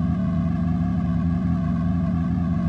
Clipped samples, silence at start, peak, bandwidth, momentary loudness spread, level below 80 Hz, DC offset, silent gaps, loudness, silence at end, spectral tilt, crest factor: under 0.1%; 0 s; -12 dBFS; 5 kHz; 0 LU; -36 dBFS; under 0.1%; none; -23 LUFS; 0 s; -10.5 dB/octave; 10 dB